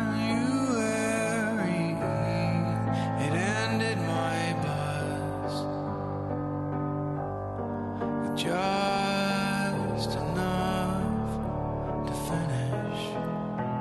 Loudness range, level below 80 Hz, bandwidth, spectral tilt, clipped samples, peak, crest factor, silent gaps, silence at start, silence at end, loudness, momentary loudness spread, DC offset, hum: 4 LU; -48 dBFS; 12 kHz; -6 dB/octave; under 0.1%; -16 dBFS; 12 dB; none; 0 s; 0 s; -29 LUFS; 5 LU; under 0.1%; none